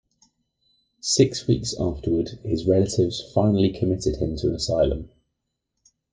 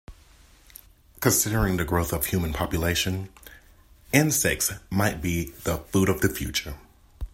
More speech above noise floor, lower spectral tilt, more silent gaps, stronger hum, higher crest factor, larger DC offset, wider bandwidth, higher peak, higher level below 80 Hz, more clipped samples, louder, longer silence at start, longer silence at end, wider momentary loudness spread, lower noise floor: first, 57 dB vs 29 dB; first, -6 dB/octave vs -4 dB/octave; neither; neither; about the same, 20 dB vs 24 dB; neither; second, 10 kHz vs 16.5 kHz; about the same, -4 dBFS vs -4 dBFS; about the same, -42 dBFS vs -40 dBFS; neither; about the same, -23 LUFS vs -25 LUFS; first, 1.05 s vs 0.1 s; first, 1.05 s vs 0.05 s; about the same, 7 LU vs 9 LU; first, -79 dBFS vs -54 dBFS